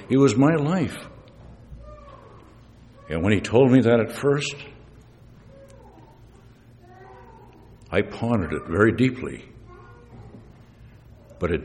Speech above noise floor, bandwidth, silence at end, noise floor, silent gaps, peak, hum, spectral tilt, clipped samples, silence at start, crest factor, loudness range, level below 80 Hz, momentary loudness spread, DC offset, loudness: 29 dB; 12.5 kHz; 0 s; -50 dBFS; none; -4 dBFS; none; -7 dB/octave; under 0.1%; 0 s; 22 dB; 9 LU; -48 dBFS; 27 LU; under 0.1%; -22 LUFS